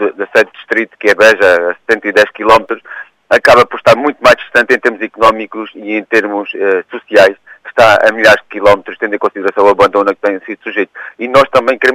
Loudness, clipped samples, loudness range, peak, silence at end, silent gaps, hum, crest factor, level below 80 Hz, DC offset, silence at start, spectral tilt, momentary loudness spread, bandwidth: -10 LUFS; 0.5%; 2 LU; 0 dBFS; 0 s; none; none; 10 dB; -44 dBFS; under 0.1%; 0 s; -4 dB/octave; 12 LU; 16 kHz